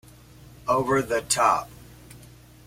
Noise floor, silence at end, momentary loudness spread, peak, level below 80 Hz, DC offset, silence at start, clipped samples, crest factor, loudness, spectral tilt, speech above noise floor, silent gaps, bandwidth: -49 dBFS; 0.5 s; 12 LU; -6 dBFS; -54 dBFS; under 0.1%; 0.65 s; under 0.1%; 22 dB; -23 LUFS; -3.5 dB/octave; 26 dB; none; 16.5 kHz